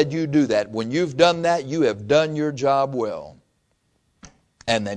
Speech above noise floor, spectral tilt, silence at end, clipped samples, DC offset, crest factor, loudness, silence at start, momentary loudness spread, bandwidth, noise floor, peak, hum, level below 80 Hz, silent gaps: 47 dB; -5.5 dB/octave; 0 s; under 0.1%; under 0.1%; 20 dB; -21 LUFS; 0 s; 8 LU; 10 kHz; -68 dBFS; -2 dBFS; none; -58 dBFS; none